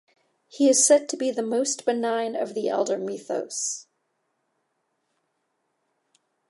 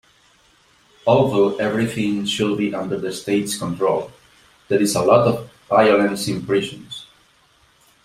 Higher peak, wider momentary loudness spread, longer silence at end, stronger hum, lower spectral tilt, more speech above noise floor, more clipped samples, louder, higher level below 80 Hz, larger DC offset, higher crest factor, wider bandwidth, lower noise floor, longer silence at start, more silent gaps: second, -6 dBFS vs -2 dBFS; about the same, 12 LU vs 11 LU; first, 2.7 s vs 1 s; neither; second, -2 dB/octave vs -5 dB/octave; first, 52 dB vs 38 dB; neither; second, -24 LUFS vs -19 LUFS; second, -86 dBFS vs -56 dBFS; neither; about the same, 20 dB vs 18 dB; second, 11.5 kHz vs 15.5 kHz; first, -75 dBFS vs -57 dBFS; second, 0.55 s vs 1.05 s; neither